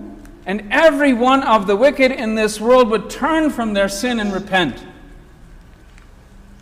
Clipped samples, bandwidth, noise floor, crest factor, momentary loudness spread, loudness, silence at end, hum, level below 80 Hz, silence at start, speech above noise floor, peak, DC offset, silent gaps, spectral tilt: under 0.1%; 16 kHz; -43 dBFS; 14 dB; 11 LU; -16 LUFS; 0.2 s; none; -42 dBFS; 0 s; 27 dB; -2 dBFS; under 0.1%; none; -4.5 dB/octave